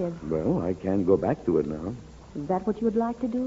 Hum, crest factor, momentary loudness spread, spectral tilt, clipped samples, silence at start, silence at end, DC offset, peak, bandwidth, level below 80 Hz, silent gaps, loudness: none; 18 dB; 13 LU; -9.5 dB/octave; under 0.1%; 0 s; 0 s; under 0.1%; -8 dBFS; 7.8 kHz; -48 dBFS; none; -27 LUFS